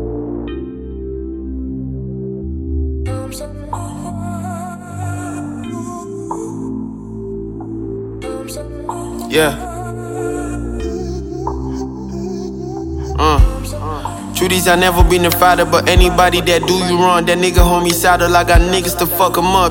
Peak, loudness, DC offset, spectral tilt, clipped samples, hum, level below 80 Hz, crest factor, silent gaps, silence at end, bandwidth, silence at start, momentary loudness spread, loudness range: 0 dBFS; -16 LUFS; under 0.1%; -4.5 dB/octave; under 0.1%; none; -22 dBFS; 16 dB; none; 0 s; 17 kHz; 0 s; 15 LU; 13 LU